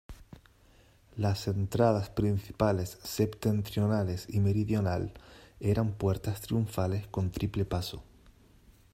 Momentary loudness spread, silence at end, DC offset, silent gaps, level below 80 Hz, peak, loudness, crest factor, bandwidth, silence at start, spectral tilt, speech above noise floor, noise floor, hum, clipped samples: 8 LU; 0.9 s; under 0.1%; none; -52 dBFS; -12 dBFS; -31 LUFS; 20 dB; 16 kHz; 0.1 s; -7 dB/octave; 31 dB; -61 dBFS; none; under 0.1%